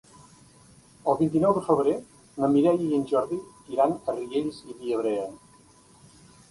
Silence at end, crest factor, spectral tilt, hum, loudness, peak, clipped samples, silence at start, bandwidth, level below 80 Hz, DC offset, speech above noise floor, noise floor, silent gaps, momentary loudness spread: 1.15 s; 18 dB; -7.5 dB/octave; none; -26 LUFS; -8 dBFS; under 0.1%; 1.05 s; 11.5 kHz; -62 dBFS; under 0.1%; 31 dB; -55 dBFS; none; 12 LU